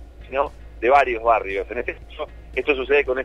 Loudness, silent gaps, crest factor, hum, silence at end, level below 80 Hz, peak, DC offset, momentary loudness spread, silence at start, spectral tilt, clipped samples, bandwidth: -21 LUFS; none; 18 dB; none; 0 s; -40 dBFS; -4 dBFS; under 0.1%; 14 LU; 0 s; -6 dB/octave; under 0.1%; 9 kHz